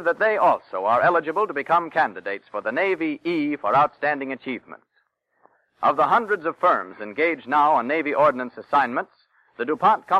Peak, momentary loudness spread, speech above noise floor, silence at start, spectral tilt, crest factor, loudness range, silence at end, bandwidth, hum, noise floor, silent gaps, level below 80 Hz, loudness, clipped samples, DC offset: -8 dBFS; 11 LU; 48 dB; 0 s; -6.5 dB/octave; 14 dB; 4 LU; 0 s; 11 kHz; none; -69 dBFS; none; -68 dBFS; -22 LUFS; under 0.1%; under 0.1%